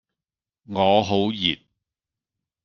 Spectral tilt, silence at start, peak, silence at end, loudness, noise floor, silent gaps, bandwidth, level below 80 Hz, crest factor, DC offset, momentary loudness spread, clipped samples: -5.5 dB/octave; 0.7 s; -4 dBFS; 1.1 s; -21 LUFS; under -90 dBFS; none; 7 kHz; -60 dBFS; 22 dB; under 0.1%; 12 LU; under 0.1%